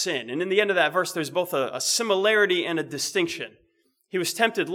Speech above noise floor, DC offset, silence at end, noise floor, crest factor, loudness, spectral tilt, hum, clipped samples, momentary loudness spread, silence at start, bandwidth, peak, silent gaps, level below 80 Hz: 43 dB; under 0.1%; 0 s; -68 dBFS; 20 dB; -24 LUFS; -2.5 dB/octave; none; under 0.1%; 8 LU; 0 s; 18 kHz; -6 dBFS; none; -78 dBFS